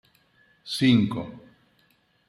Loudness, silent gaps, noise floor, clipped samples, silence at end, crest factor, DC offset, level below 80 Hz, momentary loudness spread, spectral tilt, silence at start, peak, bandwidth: -23 LUFS; none; -65 dBFS; under 0.1%; 0.9 s; 20 dB; under 0.1%; -64 dBFS; 21 LU; -6 dB/octave; 0.65 s; -8 dBFS; 12.5 kHz